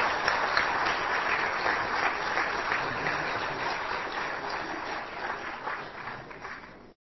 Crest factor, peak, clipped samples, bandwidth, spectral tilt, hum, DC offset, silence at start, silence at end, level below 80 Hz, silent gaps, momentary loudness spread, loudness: 24 dB; -8 dBFS; under 0.1%; 6.2 kHz; -3 dB/octave; none; under 0.1%; 0 s; 0.1 s; -56 dBFS; none; 13 LU; -29 LUFS